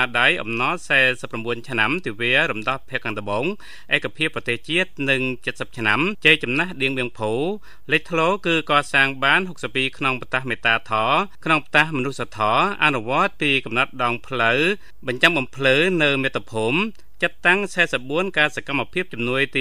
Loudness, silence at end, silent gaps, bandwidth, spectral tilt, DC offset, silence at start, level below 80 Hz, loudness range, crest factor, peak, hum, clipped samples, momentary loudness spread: -20 LUFS; 0 s; none; 15.5 kHz; -4.5 dB/octave; 2%; 0 s; -54 dBFS; 3 LU; 22 dB; 0 dBFS; none; under 0.1%; 9 LU